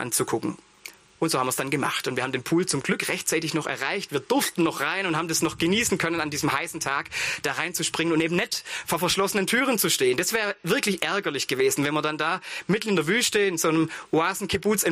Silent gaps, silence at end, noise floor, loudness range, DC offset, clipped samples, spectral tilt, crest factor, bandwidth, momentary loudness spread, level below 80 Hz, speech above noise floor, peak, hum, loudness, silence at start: none; 0 s; -47 dBFS; 2 LU; under 0.1%; under 0.1%; -3 dB/octave; 18 dB; 15.5 kHz; 6 LU; -58 dBFS; 22 dB; -8 dBFS; none; -24 LUFS; 0 s